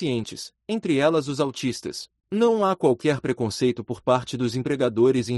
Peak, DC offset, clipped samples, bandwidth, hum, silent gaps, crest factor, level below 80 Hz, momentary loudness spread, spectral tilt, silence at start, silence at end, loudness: -8 dBFS; under 0.1%; under 0.1%; 12 kHz; none; none; 16 dB; -60 dBFS; 10 LU; -6 dB/octave; 0 s; 0 s; -24 LUFS